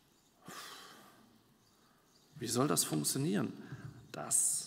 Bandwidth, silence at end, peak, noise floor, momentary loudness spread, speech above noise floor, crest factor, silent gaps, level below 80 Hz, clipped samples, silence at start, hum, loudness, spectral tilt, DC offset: 16 kHz; 0 s; -18 dBFS; -68 dBFS; 20 LU; 34 dB; 20 dB; none; -76 dBFS; under 0.1%; 0.45 s; none; -34 LUFS; -3.5 dB/octave; under 0.1%